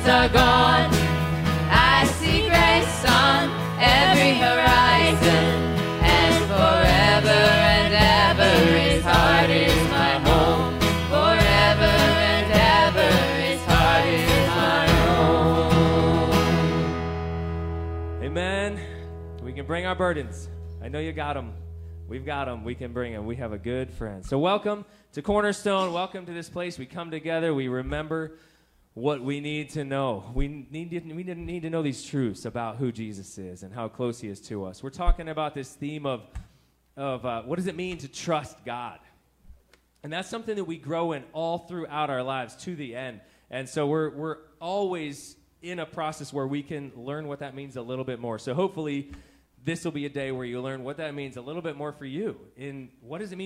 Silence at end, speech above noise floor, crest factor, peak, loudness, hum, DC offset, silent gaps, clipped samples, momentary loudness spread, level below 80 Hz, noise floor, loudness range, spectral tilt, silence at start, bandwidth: 0 s; 32 dB; 22 dB; -2 dBFS; -21 LUFS; none; under 0.1%; none; under 0.1%; 20 LU; -36 dBFS; -61 dBFS; 16 LU; -5 dB/octave; 0 s; 16 kHz